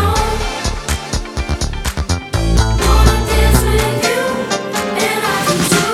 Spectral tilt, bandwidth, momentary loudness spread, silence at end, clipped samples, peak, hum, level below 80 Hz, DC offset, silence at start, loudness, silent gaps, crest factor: -4.5 dB/octave; 16 kHz; 8 LU; 0 s; under 0.1%; 0 dBFS; none; -18 dBFS; under 0.1%; 0 s; -15 LUFS; none; 14 dB